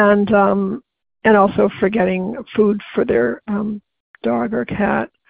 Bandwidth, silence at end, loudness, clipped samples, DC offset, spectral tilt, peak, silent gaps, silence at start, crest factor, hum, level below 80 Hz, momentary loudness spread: 4.7 kHz; 0.2 s; -17 LUFS; under 0.1%; under 0.1%; -12 dB/octave; 0 dBFS; 4.00-4.14 s; 0 s; 16 dB; none; -48 dBFS; 10 LU